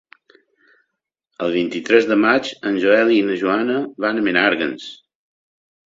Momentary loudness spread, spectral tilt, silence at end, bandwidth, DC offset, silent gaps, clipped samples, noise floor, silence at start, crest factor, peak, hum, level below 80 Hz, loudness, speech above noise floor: 9 LU; -5 dB/octave; 1 s; 7.8 kHz; under 0.1%; none; under 0.1%; -77 dBFS; 1.4 s; 20 dB; 0 dBFS; none; -62 dBFS; -18 LUFS; 60 dB